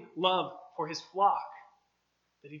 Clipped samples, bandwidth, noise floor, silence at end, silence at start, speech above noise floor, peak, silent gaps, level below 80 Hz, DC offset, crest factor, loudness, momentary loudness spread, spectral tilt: under 0.1%; 7.4 kHz; -77 dBFS; 0 s; 0 s; 47 dB; -12 dBFS; none; -90 dBFS; under 0.1%; 22 dB; -31 LUFS; 15 LU; -4 dB/octave